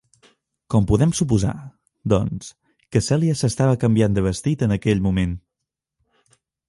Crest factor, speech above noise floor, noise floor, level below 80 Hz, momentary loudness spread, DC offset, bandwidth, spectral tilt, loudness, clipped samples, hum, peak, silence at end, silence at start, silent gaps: 18 dB; 64 dB; -83 dBFS; -38 dBFS; 11 LU; under 0.1%; 11.5 kHz; -6.5 dB/octave; -20 LUFS; under 0.1%; none; -4 dBFS; 1.3 s; 0.7 s; none